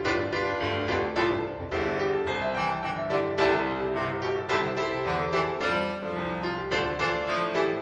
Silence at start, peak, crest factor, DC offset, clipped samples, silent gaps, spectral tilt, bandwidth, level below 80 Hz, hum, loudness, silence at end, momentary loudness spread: 0 s; -12 dBFS; 16 dB; under 0.1%; under 0.1%; none; -5.5 dB/octave; 9.6 kHz; -50 dBFS; none; -28 LUFS; 0 s; 5 LU